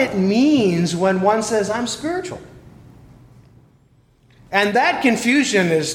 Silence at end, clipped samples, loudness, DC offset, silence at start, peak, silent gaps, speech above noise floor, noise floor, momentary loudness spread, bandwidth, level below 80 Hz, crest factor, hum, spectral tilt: 0 s; under 0.1%; -18 LUFS; under 0.1%; 0 s; 0 dBFS; none; 37 dB; -55 dBFS; 9 LU; 16.5 kHz; -54 dBFS; 18 dB; none; -4.5 dB/octave